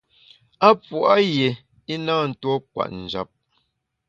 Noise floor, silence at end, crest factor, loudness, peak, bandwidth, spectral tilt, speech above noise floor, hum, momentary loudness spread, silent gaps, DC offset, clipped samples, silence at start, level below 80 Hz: -73 dBFS; 0.85 s; 22 dB; -21 LUFS; 0 dBFS; 7.6 kHz; -6.5 dB/octave; 53 dB; none; 14 LU; none; under 0.1%; under 0.1%; 0.6 s; -60 dBFS